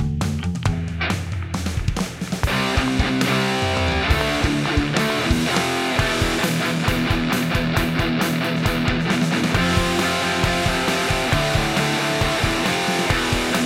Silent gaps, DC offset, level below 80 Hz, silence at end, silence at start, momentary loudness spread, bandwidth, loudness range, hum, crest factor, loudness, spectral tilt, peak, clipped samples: none; under 0.1%; -32 dBFS; 0 s; 0 s; 5 LU; 16.5 kHz; 2 LU; none; 18 dB; -20 LUFS; -4.5 dB/octave; -2 dBFS; under 0.1%